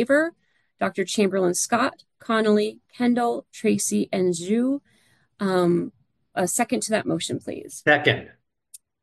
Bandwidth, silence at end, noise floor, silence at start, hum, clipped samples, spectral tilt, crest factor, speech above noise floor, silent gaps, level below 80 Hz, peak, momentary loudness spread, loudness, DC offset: 12.5 kHz; 0.75 s; -52 dBFS; 0 s; none; under 0.1%; -4 dB/octave; 20 dB; 29 dB; none; -64 dBFS; -4 dBFS; 9 LU; -23 LUFS; under 0.1%